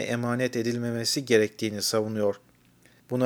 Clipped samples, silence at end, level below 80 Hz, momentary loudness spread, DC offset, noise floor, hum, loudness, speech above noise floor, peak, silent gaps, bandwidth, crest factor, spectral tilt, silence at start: under 0.1%; 0 s; -72 dBFS; 6 LU; under 0.1%; -59 dBFS; none; -27 LUFS; 33 dB; -6 dBFS; none; 19.5 kHz; 20 dB; -4.5 dB/octave; 0 s